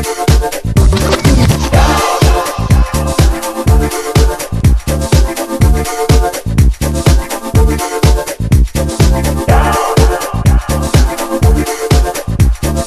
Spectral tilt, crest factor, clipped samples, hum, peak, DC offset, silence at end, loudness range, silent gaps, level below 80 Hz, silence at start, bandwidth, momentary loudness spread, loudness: -5.5 dB/octave; 10 dB; under 0.1%; none; 0 dBFS; under 0.1%; 0 s; 1 LU; none; -14 dBFS; 0 s; 14.5 kHz; 4 LU; -12 LUFS